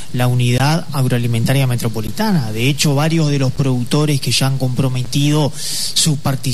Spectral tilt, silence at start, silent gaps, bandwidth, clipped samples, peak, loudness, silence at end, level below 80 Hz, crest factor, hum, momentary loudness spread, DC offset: -5 dB/octave; 0 s; none; 13.5 kHz; under 0.1%; -2 dBFS; -16 LUFS; 0 s; -42 dBFS; 12 dB; none; 4 LU; 6%